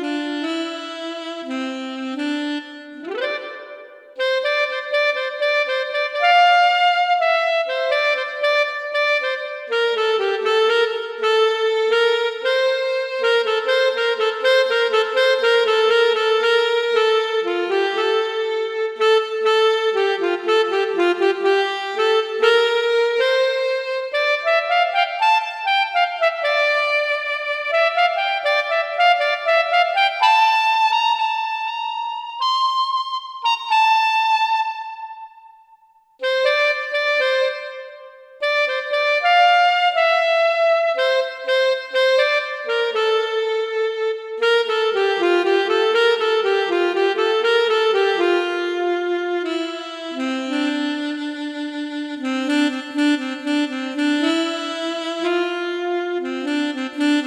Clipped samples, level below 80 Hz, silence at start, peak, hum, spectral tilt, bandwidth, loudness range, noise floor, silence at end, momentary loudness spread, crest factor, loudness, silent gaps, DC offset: under 0.1%; -74 dBFS; 0 s; -2 dBFS; none; -1 dB/octave; 12 kHz; 6 LU; -53 dBFS; 0 s; 9 LU; 16 dB; -19 LUFS; none; under 0.1%